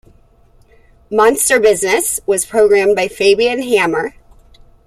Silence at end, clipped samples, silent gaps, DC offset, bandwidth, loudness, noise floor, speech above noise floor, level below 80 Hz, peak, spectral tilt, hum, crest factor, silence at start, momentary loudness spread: 0.75 s; under 0.1%; none; under 0.1%; 15 kHz; -13 LUFS; -48 dBFS; 36 dB; -46 dBFS; -2 dBFS; -2.5 dB/octave; none; 14 dB; 1.1 s; 6 LU